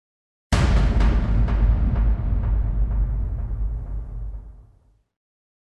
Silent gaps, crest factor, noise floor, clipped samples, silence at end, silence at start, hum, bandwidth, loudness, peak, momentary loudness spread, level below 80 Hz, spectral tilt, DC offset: none; 16 dB; -57 dBFS; under 0.1%; 1.15 s; 0.5 s; none; 9.2 kHz; -23 LUFS; -6 dBFS; 13 LU; -22 dBFS; -7 dB/octave; under 0.1%